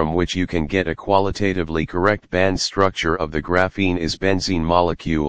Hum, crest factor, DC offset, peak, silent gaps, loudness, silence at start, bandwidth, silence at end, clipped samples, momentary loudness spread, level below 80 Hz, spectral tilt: none; 20 dB; 2%; 0 dBFS; none; -20 LUFS; 0 s; 9.8 kHz; 0 s; under 0.1%; 4 LU; -38 dBFS; -5.5 dB/octave